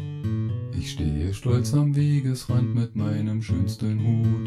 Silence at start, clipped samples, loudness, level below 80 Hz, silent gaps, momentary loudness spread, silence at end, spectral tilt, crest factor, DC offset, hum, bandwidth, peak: 0 s; under 0.1%; -25 LUFS; -42 dBFS; none; 7 LU; 0 s; -7.5 dB/octave; 14 dB; under 0.1%; none; 13 kHz; -10 dBFS